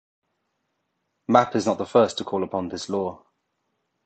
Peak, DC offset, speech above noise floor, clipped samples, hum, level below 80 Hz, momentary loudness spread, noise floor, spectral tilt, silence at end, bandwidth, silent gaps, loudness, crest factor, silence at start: -2 dBFS; under 0.1%; 54 dB; under 0.1%; none; -60 dBFS; 10 LU; -76 dBFS; -5.5 dB/octave; 0.9 s; 9 kHz; none; -23 LUFS; 24 dB; 1.3 s